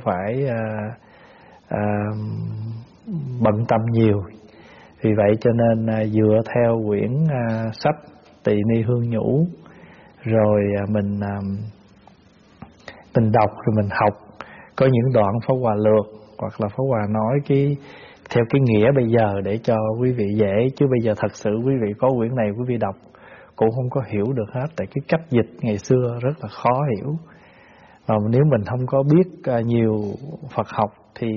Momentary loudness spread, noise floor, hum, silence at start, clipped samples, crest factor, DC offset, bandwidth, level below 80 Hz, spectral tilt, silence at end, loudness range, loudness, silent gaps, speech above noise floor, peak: 12 LU; -52 dBFS; none; 0 s; under 0.1%; 18 dB; under 0.1%; 7 kHz; -54 dBFS; -8 dB/octave; 0 s; 4 LU; -21 LUFS; none; 32 dB; -4 dBFS